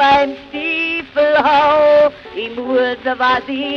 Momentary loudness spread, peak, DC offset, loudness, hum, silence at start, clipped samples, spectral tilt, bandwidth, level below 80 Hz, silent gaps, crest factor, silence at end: 11 LU; -2 dBFS; under 0.1%; -14 LUFS; none; 0 s; under 0.1%; -4.5 dB/octave; 6.6 kHz; -48 dBFS; none; 12 dB; 0 s